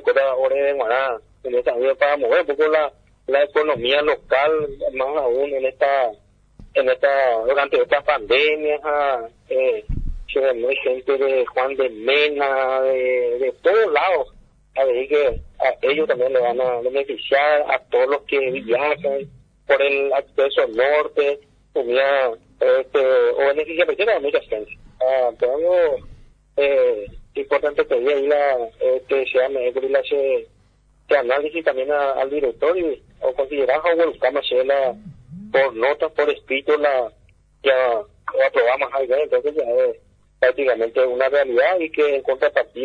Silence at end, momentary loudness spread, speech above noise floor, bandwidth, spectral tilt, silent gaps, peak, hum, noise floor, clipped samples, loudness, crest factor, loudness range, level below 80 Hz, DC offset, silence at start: 0 s; 7 LU; 38 dB; 5 kHz; -5.5 dB/octave; none; -2 dBFS; 50 Hz at -60 dBFS; -56 dBFS; under 0.1%; -19 LUFS; 18 dB; 2 LU; -44 dBFS; under 0.1%; 0 s